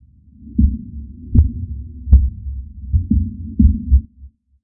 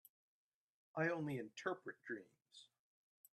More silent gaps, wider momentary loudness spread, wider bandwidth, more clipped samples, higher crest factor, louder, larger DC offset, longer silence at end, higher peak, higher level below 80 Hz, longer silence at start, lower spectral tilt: neither; second, 16 LU vs 23 LU; second, 0.8 kHz vs 12.5 kHz; neither; second, 16 dB vs 22 dB; first, -18 LUFS vs -45 LUFS; neither; second, 0.35 s vs 0.7 s; first, 0 dBFS vs -26 dBFS; first, -18 dBFS vs -90 dBFS; second, 0.4 s vs 0.95 s; first, -16 dB/octave vs -6 dB/octave